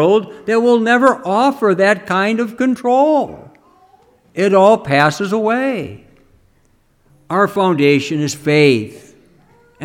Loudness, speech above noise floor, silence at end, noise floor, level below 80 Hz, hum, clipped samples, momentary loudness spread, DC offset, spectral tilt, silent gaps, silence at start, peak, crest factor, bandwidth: -14 LUFS; 42 dB; 0 s; -56 dBFS; -58 dBFS; none; under 0.1%; 8 LU; under 0.1%; -5.5 dB/octave; none; 0 s; 0 dBFS; 16 dB; 16 kHz